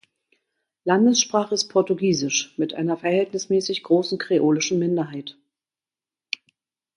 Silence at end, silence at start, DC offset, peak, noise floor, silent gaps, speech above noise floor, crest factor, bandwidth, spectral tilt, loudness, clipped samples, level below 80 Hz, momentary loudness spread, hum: 1.65 s; 0.85 s; under 0.1%; -4 dBFS; under -90 dBFS; none; over 69 dB; 20 dB; 11 kHz; -4 dB/octave; -22 LUFS; under 0.1%; -70 dBFS; 14 LU; none